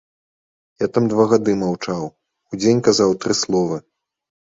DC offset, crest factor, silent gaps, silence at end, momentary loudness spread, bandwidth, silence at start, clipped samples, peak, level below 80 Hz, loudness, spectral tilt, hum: under 0.1%; 18 dB; none; 0.6 s; 12 LU; 8 kHz; 0.8 s; under 0.1%; -2 dBFS; -56 dBFS; -18 LUFS; -5 dB/octave; none